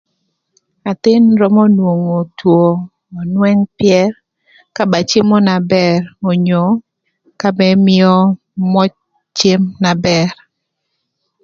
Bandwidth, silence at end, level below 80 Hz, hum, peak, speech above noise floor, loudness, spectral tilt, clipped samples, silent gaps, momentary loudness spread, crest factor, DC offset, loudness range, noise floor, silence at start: 7.4 kHz; 1.1 s; -52 dBFS; none; 0 dBFS; 60 dB; -12 LUFS; -6.5 dB/octave; under 0.1%; none; 10 LU; 12 dB; under 0.1%; 2 LU; -72 dBFS; 0.85 s